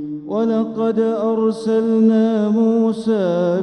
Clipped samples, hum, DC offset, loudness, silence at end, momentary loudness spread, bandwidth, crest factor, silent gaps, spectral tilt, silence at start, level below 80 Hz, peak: under 0.1%; none; under 0.1%; -17 LUFS; 0 s; 5 LU; 9 kHz; 12 dB; none; -8 dB/octave; 0 s; -64 dBFS; -6 dBFS